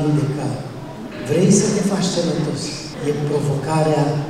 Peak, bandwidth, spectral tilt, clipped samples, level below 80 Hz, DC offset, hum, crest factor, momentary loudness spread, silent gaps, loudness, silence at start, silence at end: -2 dBFS; 13 kHz; -5.5 dB/octave; under 0.1%; -48 dBFS; under 0.1%; none; 16 dB; 14 LU; none; -19 LUFS; 0 s; 0 s